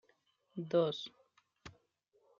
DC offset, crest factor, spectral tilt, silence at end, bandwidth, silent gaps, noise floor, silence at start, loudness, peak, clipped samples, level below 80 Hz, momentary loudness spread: under 0.1%; 20 dB; -5 dB/octave; 0.7 s; 7.2 kHz; none; -76 dBFS; 0.55 s; -36 LUFS; -20 dBFS; under 0.1%; -78 dBFS; 24 LU